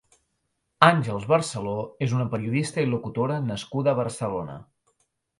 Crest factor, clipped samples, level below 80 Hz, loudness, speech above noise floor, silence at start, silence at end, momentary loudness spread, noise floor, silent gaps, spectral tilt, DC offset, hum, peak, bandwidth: 26 dB; under 0.1%; -60 dBFS; -25 LUFS; 52 dB; 0.8 s; 0.75 s; 11 LU; -76 dBFS; none; -6 dB/octave; under 0.1%; none; 0 dBFS; 11.5 kHz